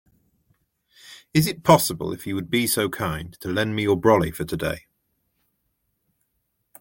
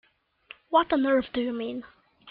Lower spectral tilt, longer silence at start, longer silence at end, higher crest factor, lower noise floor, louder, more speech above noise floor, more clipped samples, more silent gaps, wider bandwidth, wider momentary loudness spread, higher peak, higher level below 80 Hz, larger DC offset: second, -5 dB/octave vs -8 dB/octave; first, 1.05 s vs 0.7 s; first, 2 s vs 0 s; about the same, 22 dB vs 20 dB; first, -74 dBFS vs -53 dBFS; first, -22 LUFS vs -26 LUFS; first, 52 dB vs 27 dB; neither; neither; first, 17 kHz vs 5 kHz; about the same, 12 LU vs 12 LU; first, -2 dBFS vs -8 dBFS; first, -50 dBFS vs -62 dBFS; neither